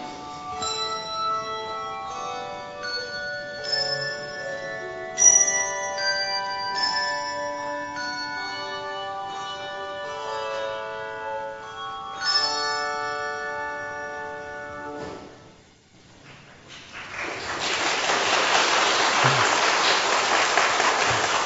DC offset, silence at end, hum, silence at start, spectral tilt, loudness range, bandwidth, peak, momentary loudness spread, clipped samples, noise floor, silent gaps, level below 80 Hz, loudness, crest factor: under 0.1%; 0 s; none; 0 s; -0.5 dB/octave; 12 LU; 8.2 kHz; -4 dBFS; 15 LU; under 0.1%; -53 dBFS; none; -62 dBFS; -24 LUFS; 22 dB